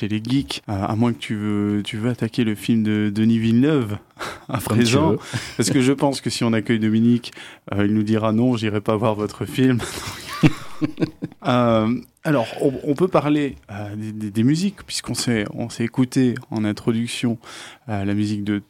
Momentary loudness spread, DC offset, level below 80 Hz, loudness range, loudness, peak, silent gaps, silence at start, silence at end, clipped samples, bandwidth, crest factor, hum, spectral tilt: 11 LU; under 0.1%; -52 dBFS; 3 LU; -21 LUFS; -4 dBFS; none; 0 s; 0.05 s; under 0.1%; 16 kHz; 18 dB; none; -6 dB/octave